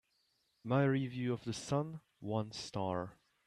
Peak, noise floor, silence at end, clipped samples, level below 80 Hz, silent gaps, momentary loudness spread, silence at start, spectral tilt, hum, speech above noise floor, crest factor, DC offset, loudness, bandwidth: -20 dBFS; -78 dBFS; 0.35 s; under 0.1%; -72 dBFS; none; 14 LU; 0.65 s; -6.5 dB/octave; none; 42 dB; 18 dB; under 0.1%; -37 LUFS; 11.5 kHz